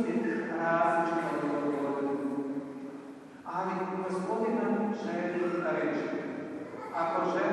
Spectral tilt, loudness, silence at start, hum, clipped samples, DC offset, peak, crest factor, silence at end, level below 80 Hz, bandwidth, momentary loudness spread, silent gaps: -7 dB/octave; -32 LUFS; 0 s; none; under 0.1%; under 0.1%; -16 dBFS; 16 dB; 0 s; -78 dBFS; 11.5 kHz; 12 LU; none